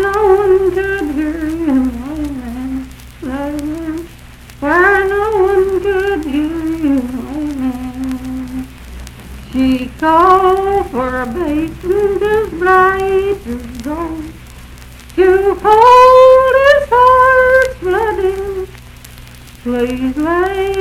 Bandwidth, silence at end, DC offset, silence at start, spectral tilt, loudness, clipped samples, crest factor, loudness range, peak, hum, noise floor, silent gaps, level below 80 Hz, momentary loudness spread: 15.5 kHz; 0 s; under 0.1%; 0 s; -6 dB/octave; -13 LUFS; 0.7%; 12 dB; 11 LU; 0 dBFS; none; -35 dBFS; none; -34 dBFS; 16 LU